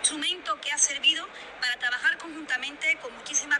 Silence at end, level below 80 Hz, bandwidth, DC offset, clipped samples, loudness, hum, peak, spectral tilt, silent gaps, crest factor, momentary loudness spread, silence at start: 0 s; -68 dBFS; 12.5 kHz; under 0.1%; under 0.1%; -26 LUFS; none; -6 dBFS; 2.5 dB/octave; none; 22 dB; 9 LU; 0 s